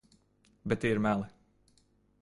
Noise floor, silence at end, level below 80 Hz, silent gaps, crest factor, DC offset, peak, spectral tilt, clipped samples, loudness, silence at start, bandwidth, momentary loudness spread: -69 dBFS; 0.95 s; -60 dBFS; none; 20 dB; under 0.1%; -14 dBFS; -7 dB/octave; under 0.1%; -31 LUFS; 0.65 s; 11.5 kHz; 16 LU